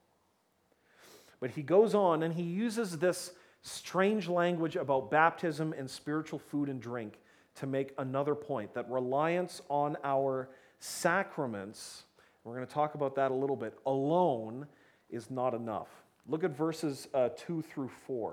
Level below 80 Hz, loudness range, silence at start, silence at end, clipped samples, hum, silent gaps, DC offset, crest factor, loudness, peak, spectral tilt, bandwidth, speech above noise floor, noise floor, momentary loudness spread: -80 dBFS; 5 LU; 1.1 s; 0 s; under 0.1%; none; none; under 0.1%; 22 dB; -33 LUFS; -12 dBFS; -5.5 dB/octave; 17 kHz; 41 dB; -74 dBFS; 15 LU